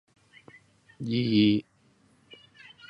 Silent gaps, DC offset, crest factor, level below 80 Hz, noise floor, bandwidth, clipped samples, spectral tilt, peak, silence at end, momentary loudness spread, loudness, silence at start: none; under 0.1%; 18 dB; -64 dBFS; -64 dBFS; 6.2 kHz; under 0.1%; -8 dB/octave; -12 dBFS; 1.3 s; 18 LU; -26 LUFS; 1 s